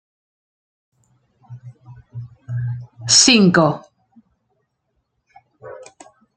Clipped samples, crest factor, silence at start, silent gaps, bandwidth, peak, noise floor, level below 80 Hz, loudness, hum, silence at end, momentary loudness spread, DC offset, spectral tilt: under 0.1%; 20 dB; 1.5 s; none; 11 kHz; 0 dBFS; -72 dBFS; -58 dBFS; -14 LUFS; none; 0.55 s; 28 LU; under 0.1%; -3 dB/octave